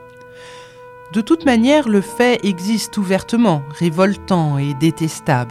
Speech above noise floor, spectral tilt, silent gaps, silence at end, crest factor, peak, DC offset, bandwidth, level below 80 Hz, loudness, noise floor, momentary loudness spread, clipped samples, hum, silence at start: 23 dB; -6 dB/octave; none; 0 s; 16 dB; 0 dBFS; under 0.1%; 15 kHz; -50 dBFS; -16 LUFS; -39 dBFS; 9 LU; under 0.1%; none; 0 s